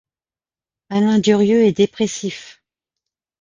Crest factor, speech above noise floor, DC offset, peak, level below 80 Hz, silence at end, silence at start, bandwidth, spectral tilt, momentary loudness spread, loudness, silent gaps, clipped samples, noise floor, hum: 16 dB; over 74 dB; under 0.1%; -2 dBFS; -58 dBFS; 0.9 s; 0.9 s; 9.4 kHz; -5.5 dB/octave; 13 LU; -16 LUFS; none; under 0.1%; under -90 dBFS; none